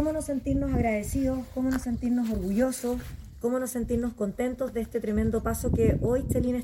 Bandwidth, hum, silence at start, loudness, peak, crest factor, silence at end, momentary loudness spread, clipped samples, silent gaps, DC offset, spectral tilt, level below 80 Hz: 17 kHz; none; 0 s; -28 LUFS; -12 dBFS; 16 dB; 0 s; 6 LU; under 0.1%; none; under 0.1%; -7 dB/octave; -38 dBFS